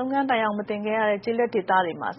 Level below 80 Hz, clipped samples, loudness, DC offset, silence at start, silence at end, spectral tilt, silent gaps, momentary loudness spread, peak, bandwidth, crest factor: -68 dBFS; under 0.1%; -24 LUFS; under 0.1%; 0 s; 0 s; -3 dB/octave; none; 4 LU; -8 dBFS; 5.8 kHz; 16 dB